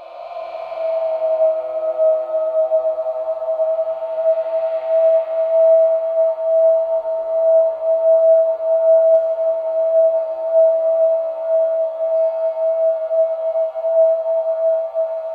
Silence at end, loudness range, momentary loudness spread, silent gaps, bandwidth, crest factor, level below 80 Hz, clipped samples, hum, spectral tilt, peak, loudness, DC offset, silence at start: 0 s; 4 LU; 8 LU; none; 4.2 kHz; 10 dB; -72 dBFS; under 0.1%; none; -5 dB/octave; -6 dBFS; -17 LUFS; under 0.1%; 0 s